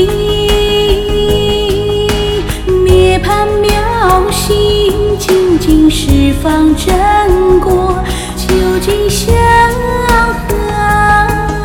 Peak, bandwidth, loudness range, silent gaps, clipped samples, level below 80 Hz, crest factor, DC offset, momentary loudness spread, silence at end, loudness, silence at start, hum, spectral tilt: 0 dBFS; 18.5 kHz; 1 LU; none; 0.3%; -18 dBFS; 10 dB; under 0.1%; 5 LU; 0 s; -10 LUFS; 0 s; none; -5 dB/octave